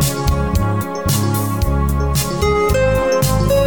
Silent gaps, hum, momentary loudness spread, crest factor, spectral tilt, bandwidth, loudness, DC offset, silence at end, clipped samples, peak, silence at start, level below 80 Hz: none; none; 3 LU; 12 dB; -5.5 dB/octave; 19.5 kHz; -17 LUFS; 1%; 0 s; under 0.1%; -4 dBFS; 0 s; -22 dBFS